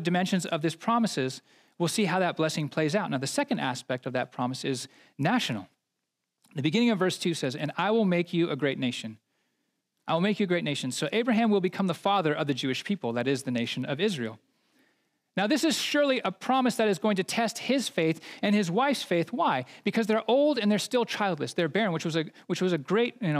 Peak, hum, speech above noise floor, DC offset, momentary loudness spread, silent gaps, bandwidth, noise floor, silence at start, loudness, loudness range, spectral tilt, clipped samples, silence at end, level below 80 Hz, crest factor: -10 dBFS; none; 56 dB; under 0.1%; 7 LU; none; 15.5 kHz; -83 dBFS; 0 s; -28 LUFS; 3 LU; -5 dB/octave; under 0.1%; 0 s; -86 dBFS; 18 dB